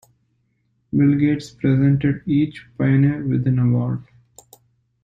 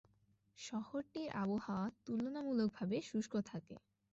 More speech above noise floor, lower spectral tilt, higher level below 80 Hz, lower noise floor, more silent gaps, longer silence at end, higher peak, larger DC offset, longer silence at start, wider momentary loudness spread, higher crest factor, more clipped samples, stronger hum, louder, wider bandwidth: first, 49 dB vs 34 dB; first, -9 dB/octave vs -6 dB/octave; first, -50 dBFS vs -76 dBFS; second, -67 dBFS vs -76 dBFS; neither; first, 1 s vs 0.35 s; first, -6 dBFS vs -28 dBFS; neither; first, 0.95 s vs 0.6 s; second, 8 LU vs 12 LU; about the same, 14 dB vs 16 dB; neither; neither; first, -19 LUFS vs -42 LUFS; about the same, 7.8 kHz vs 8 kHz